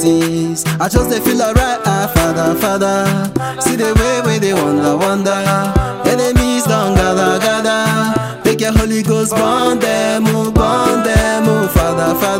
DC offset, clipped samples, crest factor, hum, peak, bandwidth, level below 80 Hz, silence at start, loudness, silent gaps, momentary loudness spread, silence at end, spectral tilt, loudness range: under 0.1%; under 0.1%; 12 dB; none; 0 dBFS; 16.5 kHz; -24 dBFS; 0 s; -14 LUFS; none; 3 LU; 0 s; -5 dB/octave; 1 LU